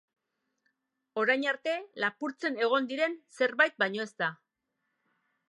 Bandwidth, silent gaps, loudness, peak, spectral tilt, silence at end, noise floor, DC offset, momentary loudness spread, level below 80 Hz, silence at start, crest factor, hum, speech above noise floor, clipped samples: 11.5 kHz; none; -30 LUFS; -8 dBFS; -4 dB/octave; 1.15 s; -83 dBFS; under 0.1%; 8 LU; -88 dBFS; 1.15 s; 24 dB; none; 52 dB; under 0.1%